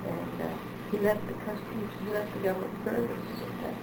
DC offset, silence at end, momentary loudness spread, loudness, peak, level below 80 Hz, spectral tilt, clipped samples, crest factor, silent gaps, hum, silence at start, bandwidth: under 0.1%; 0 s; 8 LU; -33 LUFS; -14 dBFS; -58 dBFS; -7 dB/octave; under 0.1%; 20 dB; none; none; 0 s; over 20 kHz